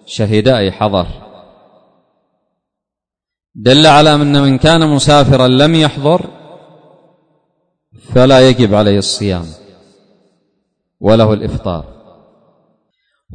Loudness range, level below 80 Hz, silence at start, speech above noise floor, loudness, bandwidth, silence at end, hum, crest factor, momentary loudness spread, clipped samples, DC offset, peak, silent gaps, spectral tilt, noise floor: 9 LU; -36 dBFS; 0.1 s; 75 dB; -10 LUFS; 9.6 kHz; 0 s; none; 12 dB; 13 LU; 0.2%; under 0.1%; 0 dBFS; none; -5.5 dB/octave; -84 dBFS